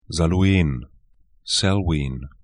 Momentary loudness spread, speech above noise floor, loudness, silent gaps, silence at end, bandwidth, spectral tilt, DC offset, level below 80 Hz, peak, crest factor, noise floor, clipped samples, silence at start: 13 LU; 37 dB; -21 LUFS; none; 0.15 s; 10.5 kHz; -5 dB/octave; 0.1%; -34 dBFS; -6 dBFS; 16 dB; -57 dBFS; under 0.1%; 0.1 s